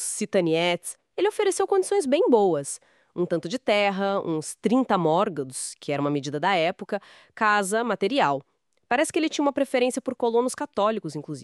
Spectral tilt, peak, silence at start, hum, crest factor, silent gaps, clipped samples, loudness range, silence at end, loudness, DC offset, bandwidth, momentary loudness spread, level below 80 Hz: -4 dB/octave; -6 dBFS; 0 s; none; 18 dB; none; under 0.1%; 1 LU; 0 s; -24 LUFS; under 0.1%; 13.5 kHz; 10 LU; -74 dBFS